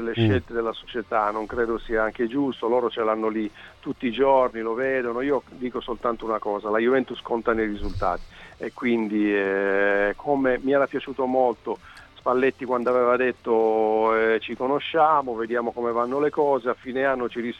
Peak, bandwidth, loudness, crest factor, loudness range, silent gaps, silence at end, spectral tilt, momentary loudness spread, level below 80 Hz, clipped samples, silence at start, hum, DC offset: -8 dBFS; 8.2 kHz; -24 LUFS; 16 dB; 3 LU; none; 0 s; -7.5 dB/octave; 8 LU; -46 dBFS; under 0.1%; 0 s; none; under 0.1%